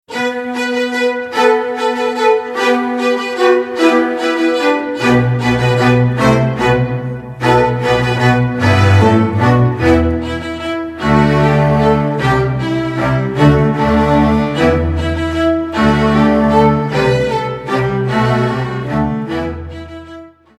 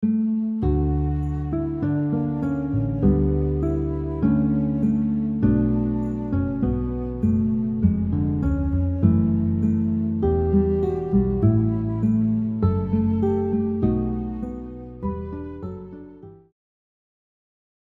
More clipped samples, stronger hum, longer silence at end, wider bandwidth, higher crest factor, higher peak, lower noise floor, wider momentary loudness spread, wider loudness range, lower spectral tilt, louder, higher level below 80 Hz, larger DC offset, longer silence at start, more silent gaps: neither; neither; second, 0.3 s vs 1.55 s; first, 13.5 kHz vs 3.3 kHz; second, 12 dB vs 18 dB; first, 0 dBFS vs -4 dBFS; second, -35 dBFS vs -43 dBFS; about the same, 8 LU vs 10 LU; second, 2 LU vs 6 LU; second, -7 dB/octave vs -12.5 dB/octave; first, -13 LUFS vs -23 LUFS; about the same, -30 dBFS vs -32 dBFS; neither; about the same, 0.1 s vs 0 s; neither